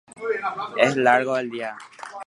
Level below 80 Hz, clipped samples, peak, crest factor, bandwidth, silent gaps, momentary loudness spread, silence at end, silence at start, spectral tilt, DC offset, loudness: -72 dBFS; under 0.1%; 0 dBFS; 22 dB; 11.5 kHz; none; 16 LU; 0 s; 0.15 s; -4.5 dB/octave; under 0.1%; -22 LUFS